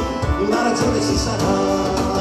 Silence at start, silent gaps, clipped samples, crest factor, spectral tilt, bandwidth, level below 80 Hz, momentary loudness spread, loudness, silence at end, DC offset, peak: 0 s; none; under 0.1%; 14 dB; -5 dB/octave; 15 kHz; -30 dBFS; 2 LU; -19 LUFS; 0 s; under 0.1%; -6 dBFS